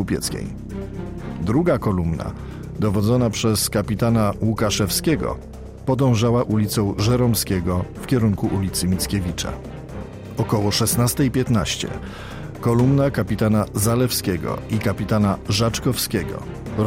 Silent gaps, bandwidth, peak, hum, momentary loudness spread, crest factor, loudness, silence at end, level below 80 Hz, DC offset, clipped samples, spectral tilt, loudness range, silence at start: none; 16 kHz; -8 dBFS; none; 13 LU; 14 dB; -21 LUFS; 0 s; -38 dBFS; under 0.1%; under 0.1%; -5.5 dB/octave; 2 LU; 0 s